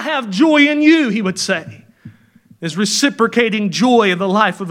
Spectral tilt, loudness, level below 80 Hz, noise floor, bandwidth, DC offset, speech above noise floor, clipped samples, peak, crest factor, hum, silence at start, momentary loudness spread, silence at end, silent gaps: -4 dB/octave; -14 LUFS; -64 dBFS; -48 dBFS; 15.5 kHz; under 0.1%; 34 dB; under 0.1%; 0 dBFS; 16 dB; none; 0 s; 9 LU; 0 s; none